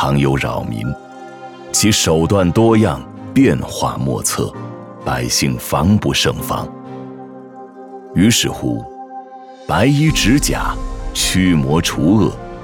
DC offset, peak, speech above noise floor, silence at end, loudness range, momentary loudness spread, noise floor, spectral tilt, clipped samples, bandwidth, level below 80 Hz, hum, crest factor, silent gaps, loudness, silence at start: under 0.1%; 0 dBFS; 20 dB; 0 s; 4 LU; 20 LU; -35 dBFS; -4.5 dB/octave; under 0.1%; 19.5 kHz; -32 dBFS; none; 16 dB; none; -15 LUFS; 0 s